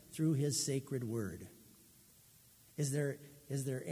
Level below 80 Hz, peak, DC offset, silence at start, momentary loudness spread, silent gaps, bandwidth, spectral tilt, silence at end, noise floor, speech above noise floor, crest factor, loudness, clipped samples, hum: -70 dBFS; -24 dBFS; under 0.1%; 0.05 s; 17 LU; none; 16 kHz; -5 dB/octave; 0 s; -64 dBFS; 27 dB; 16 dB; -38 LUFS; under 0.1%; none